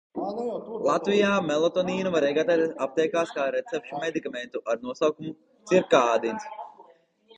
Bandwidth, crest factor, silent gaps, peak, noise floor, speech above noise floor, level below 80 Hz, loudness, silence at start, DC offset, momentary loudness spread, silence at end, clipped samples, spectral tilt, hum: 8.8 kHz; 20 dB; none; -6 dBFS; -57 dBFS; 32 dB; -68 dBFS; -26 LUFS; 0.15 s; under 0.1%; 13 LU; 0.55 s; under 0.1%; -5 dB/octave; none